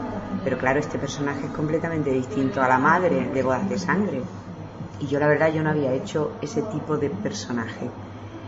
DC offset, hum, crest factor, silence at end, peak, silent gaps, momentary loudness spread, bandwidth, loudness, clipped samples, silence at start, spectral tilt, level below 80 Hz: under 0.1%; none; 20 dB; 0 s; -4 dBFS; none; 14 LU; 8 kHz; -24 LUFS; under 0.1%; 0 s; -6.5 dB/octave; -52 dBFS